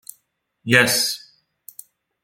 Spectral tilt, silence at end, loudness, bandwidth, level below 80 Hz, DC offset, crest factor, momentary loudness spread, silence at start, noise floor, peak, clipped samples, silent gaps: -2.5 dB/octave; 1.05 s; -17 LUFS; 17 kHz; -64 dBFS; under 0.1%; 24 dB; 26 LU; 0.65 s; -68 dBFS; 0 dBFS; under 0.1%; none